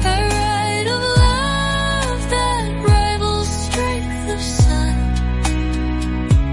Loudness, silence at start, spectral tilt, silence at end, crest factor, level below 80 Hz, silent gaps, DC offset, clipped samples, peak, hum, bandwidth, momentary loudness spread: -18 LUFS; 0 s; -5 dB/octave; 0 s; 14 dB; -22 dBFS; none; under 0.1%; under 0.1%; -4 dBFS; none; 11.5 kHz; 6 LU